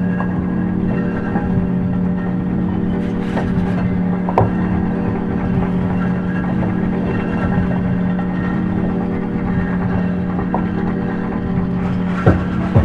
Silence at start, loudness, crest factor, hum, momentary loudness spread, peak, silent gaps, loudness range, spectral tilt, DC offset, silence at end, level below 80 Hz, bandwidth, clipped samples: 0 s; -18 LUFS; 18 dB; none; 3 LU; 0 dBFS; none; 1 LU; -10 dB/octave; under 0.1%; 0 s; -32 dBFS; 5 kHz; under 0.1%